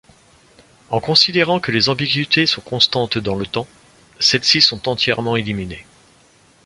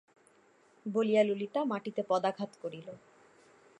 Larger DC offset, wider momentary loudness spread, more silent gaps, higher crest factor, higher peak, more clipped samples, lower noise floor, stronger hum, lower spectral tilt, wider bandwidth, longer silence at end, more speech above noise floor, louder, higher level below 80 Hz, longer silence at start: neither; second, 13 LU vs 19 LU; neither; about the same, 18 dB vs 20 dB; first, 0 dBFS vs -14 dBFS; neither; second, -52 dBFS vs -65 dBFS; neither; second, -3.5 dB/octave vs -6.5 dB/octave; about the same, 11.5 kHz vs 10.5 kHz; about the same, 0.85 s vs 0.85 s; about the same, 34 dB vs 33 dB; first, -16 LUFS vs -32 LUFS; first, -48 dBFS vs -86 dBFS; about the same, 0.9 s vs 0.85 s